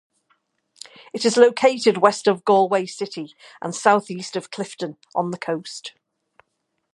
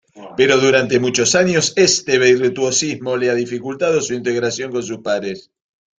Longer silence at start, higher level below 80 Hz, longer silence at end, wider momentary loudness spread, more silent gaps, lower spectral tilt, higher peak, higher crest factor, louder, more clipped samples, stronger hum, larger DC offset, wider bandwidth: first, 1.15 s vs 0.15 s; second, -74 dBFS vs -56 dBFS; first, 1.05 s vs 0.6 s; first, 19 LU vs 10 LU; neither; about the same, -4 dB/octave vs -3 dB/octave; about the same, 0 dBFS vs 0 dBFS; first, 22 dB vs 16 dB; second, -20 LUFS vs -16 LUFS; neither; neither; neither; first, 11.5 kHz vs 9.6 kHz